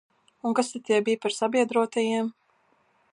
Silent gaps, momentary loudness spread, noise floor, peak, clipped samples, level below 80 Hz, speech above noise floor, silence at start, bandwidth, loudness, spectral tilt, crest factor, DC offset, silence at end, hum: none; 6 LU; -66 dBFS; -8 dBFS; under 0.1%; -80 dBFS; 42 dB; 0.45 s; 11.5 kHz; -26 LUFS; -4 dB/octave; 18 dB; under 0.1%; 0.8 s; none